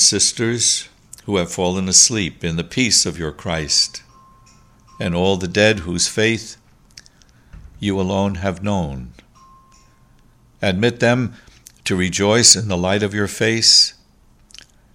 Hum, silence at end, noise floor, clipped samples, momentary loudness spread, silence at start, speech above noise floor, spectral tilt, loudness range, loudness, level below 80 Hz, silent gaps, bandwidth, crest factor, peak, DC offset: none; 1.05 s; -52 dBFS; under 0.1%; 15 LU; 0 s; 35 dB; -2.5 dB/octave; 10 LU; -16 LUFS; -44 dBFS; none; 16 kHz; 20 dB; 0 dBFS; under 0.1%